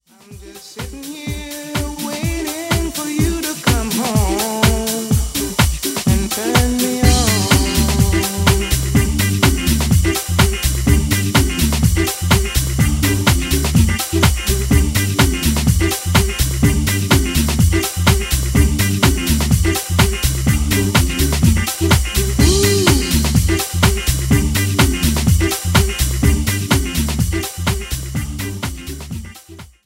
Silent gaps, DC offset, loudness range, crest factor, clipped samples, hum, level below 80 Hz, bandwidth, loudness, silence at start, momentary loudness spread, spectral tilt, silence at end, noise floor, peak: none; under 0.1%; 4 LU; 16 dB; under 0.1%; none; -22 dBFS; 16.5 kHz; -16 LUFS; 0.3 s; 9 LU; -4.5 dB/octave; 0.2 s; -38 dBFS; 0 dBFS